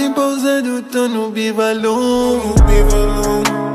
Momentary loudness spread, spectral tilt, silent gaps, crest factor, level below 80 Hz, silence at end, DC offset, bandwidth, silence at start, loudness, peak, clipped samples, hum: 5 LU; -5.5 dB/octave; none; 14 dB; -18 dBFS; 0 s; under 0.1%; 15 kHz; 0 s; -15 LUFS; 0 dBFS; under 0.1%; none